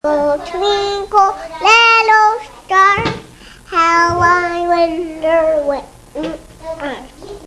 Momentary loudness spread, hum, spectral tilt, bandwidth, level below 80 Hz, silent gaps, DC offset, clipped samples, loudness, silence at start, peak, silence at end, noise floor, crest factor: 17 LU; none; -3.5 dB/octave; 12 kHz; -42 dBFS; none; under 0.1%; under 0.1%; -12 LUFS; 0.05 s; 0 dBFS; 0 s; -38 dBFS; 14 dB